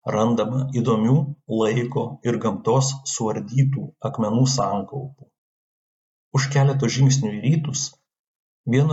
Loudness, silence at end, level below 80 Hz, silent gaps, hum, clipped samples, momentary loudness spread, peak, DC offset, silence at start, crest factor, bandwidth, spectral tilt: -22 LUFS; 0 s; -64 dBFS; 5.38-6.31 s, 8.19-8.64 s; none; under 0.1%; 9 LU; -6 dBFS; under 0.1%; 0.05 s; 16 dB; 8 kHz; -6 dB/octave